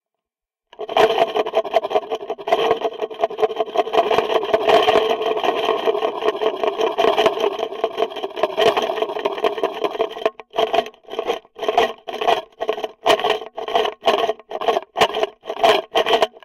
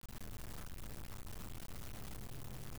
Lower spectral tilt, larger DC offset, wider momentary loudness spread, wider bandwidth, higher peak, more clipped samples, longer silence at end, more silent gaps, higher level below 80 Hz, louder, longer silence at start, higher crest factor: second, -3 dB/octave vs -4.5 dB/octave; second, under 0.1% vs 0.4%; first, 8 LU vs 1 LU; second, 16 kHz vs over 20 kHz; first, -4 dBFS vs -42 dBFS; neither; about the same, 0.05 s vs 0 s; neither; second, -58 dBFS vs -52 dBFS; first, -20 LUFS vs -50 LUFS; first, 0.8 s vs 0.05 s; first, 16 dB vs 0 dB